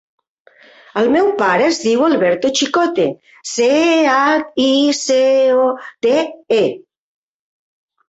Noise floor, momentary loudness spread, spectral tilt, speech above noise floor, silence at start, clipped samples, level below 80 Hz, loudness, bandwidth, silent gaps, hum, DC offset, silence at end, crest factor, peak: -46 dBFS; 7 LU; -3.5 dB/octave; 32 dB; 0.95 s; under 0.1%; -60 dBFS; -15 LUFS; 8.2 kHz; none; none; under 0.1%; 1.3 s; 14 dB; -2 dBFS